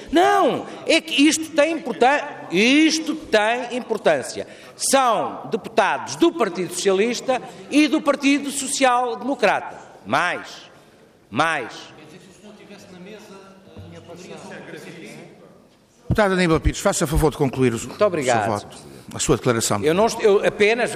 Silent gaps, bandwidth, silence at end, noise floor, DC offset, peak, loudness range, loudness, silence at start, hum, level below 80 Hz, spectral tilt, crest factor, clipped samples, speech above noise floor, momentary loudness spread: none; 15.5 kHz; 0 s; -53 dBFS; under 0.1%; -6 dBFS; 12 LU; -20 LUFS; 0 s; none; -40 dBFS; -4 dB/octave; 16 dB; under 0.1%; 33 dB; 21 LU